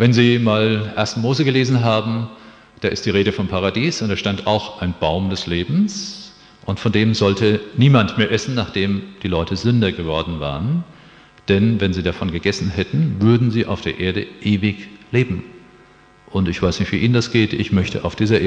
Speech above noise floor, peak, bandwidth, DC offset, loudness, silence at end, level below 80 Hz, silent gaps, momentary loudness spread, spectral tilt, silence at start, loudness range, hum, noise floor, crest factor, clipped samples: 31 dB; 0 dBFS; 8.6 kHz; under 0.1%; -19 LUFS; 0 s; -42 dBFS; none; 9 LU; -6.5 dB/octave; 0 s; 3 LU; none; -48 dBFS; 18 dB; under 0.1%